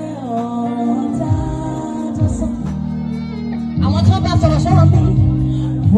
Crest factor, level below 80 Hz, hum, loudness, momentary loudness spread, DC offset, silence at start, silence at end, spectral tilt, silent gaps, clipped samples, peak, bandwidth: 16 dB; -30 dBFS; none; -17 LUFS; 11 LU; under 0.1%; 0 s; 0 s; -8.5 dB/octave; none; under 0.1%; 0 dBFS; 9.2 kHz